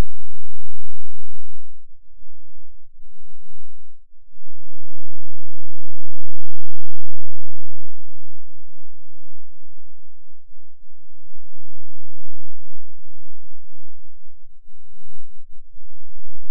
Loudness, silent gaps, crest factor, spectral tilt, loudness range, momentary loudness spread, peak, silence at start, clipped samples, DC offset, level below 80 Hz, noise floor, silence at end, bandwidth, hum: -50 LUFS; none; 8 dB; -14 dB/octave; 5 LU; 9 LU; 0 dBFS; 0 s; under 0.1%; under 0.1%; -46 dBFS; under -90 dBFS; 0 s; 0.3 kHz; none